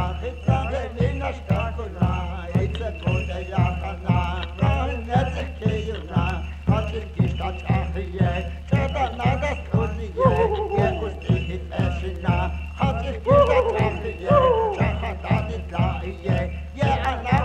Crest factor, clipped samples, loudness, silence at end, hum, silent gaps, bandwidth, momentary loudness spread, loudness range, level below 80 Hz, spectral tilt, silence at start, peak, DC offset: 18 dB; under 0.1%; -24 LUFS; 0 s; none; none; 8.8 kHz; 9 LU; 4 LU; -30 dBFS; -8 dB/octave; 0 s; -4 dBFS; under 0.1%